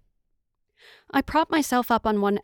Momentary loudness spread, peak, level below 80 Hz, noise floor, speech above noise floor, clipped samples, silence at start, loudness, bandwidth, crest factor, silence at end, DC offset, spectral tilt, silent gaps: 4 LU; -8 dBFS; -50 dBFS; -73 dBFS; 51 dB; under 0.1%; 1.15 s; -23 LUFS; over 20 kHz; 16 dB; 0.05 s; under 0.1%; -4.5 dB/octave; none